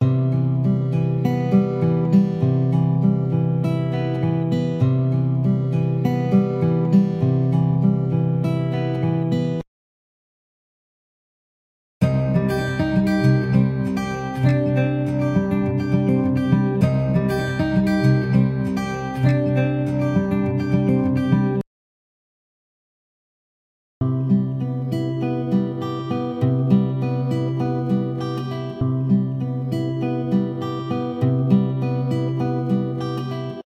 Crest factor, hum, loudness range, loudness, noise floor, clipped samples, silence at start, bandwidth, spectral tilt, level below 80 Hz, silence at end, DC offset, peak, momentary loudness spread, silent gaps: 16 dB; none; 6 LU; -21 LUFS; under -90 dBFS; under 0.1%; 0 s; 7 kHz; -9 dB/octave; -46 dBFS; 0.15 s; under 0.1%; -4 dBFS; 7 LU; 9.67-12.01 s, 21.67-24.01 s